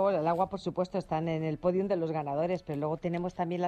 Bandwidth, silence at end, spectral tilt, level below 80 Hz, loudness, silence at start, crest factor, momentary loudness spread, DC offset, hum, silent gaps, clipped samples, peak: 9 kHz; 0 s; -8 dB/octave; -60 dBFS; -32 LUFS; 0 s; 16 dB; 5 LU; under 0.1%; none; none; under 0.1%; -14 dBFS